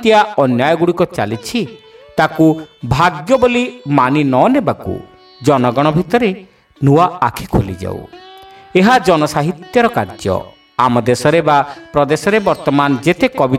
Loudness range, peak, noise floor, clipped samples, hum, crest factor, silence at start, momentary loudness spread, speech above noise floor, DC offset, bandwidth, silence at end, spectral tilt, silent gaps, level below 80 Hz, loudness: 2 LU; 0 dBFS; -38 dBFS; under 0.1%; none; 14 dB; 0 s; 10 LU; 25 dB; under 0.1%; 16 kHz; 0 s; -6 dB/octave; none; -40 dBFS; -14 LUFS